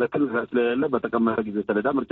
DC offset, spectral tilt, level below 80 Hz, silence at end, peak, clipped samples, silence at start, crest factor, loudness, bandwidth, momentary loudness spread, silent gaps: under 0.1%; -5 dB/octave; -60 dBFS; 0.05 s; -8 dBFS; under 0.1%; 0 s; 16 dB; -24 LUFS; 4.1 kHz; 2 LU; none